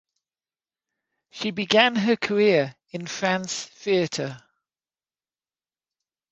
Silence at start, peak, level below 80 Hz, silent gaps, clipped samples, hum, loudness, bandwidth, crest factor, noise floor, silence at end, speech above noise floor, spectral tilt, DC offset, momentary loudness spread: 1.35 s; -2 dBFS; -70 dBFS; none; under 0.1%; none; -23 LUFS; 8.2 kHz; 24 dB; under -90 dBFS; 1.95 s; over 67 dB; -4 dB/octave; under 0.1%; 13 LU